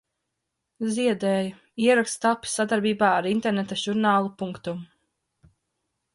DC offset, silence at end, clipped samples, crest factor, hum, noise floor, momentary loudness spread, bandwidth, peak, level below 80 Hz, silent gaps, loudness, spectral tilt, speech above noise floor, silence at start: under 0.1%; 1.3 s; under 0.1%; 18 dB; none; -81 dBFS; 11 LU; 11.5 kHz; -8 dBFS; -66 dBFS; none; -24 LUFS; -4.5 dB/octave; 57 dB; 0.8 s